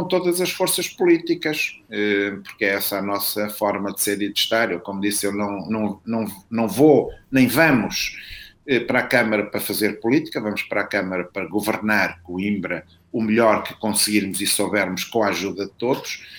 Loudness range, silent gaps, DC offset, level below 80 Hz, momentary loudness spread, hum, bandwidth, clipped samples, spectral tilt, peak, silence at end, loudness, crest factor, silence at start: 3 LU; none; under 0.1%; -56 dBFS; 9 LU; none; over 20 kHz; under 0.1%; -3.5 dB/octave; -2 dBFS; 0 s; -21 LUFS; 20 dB; 0 s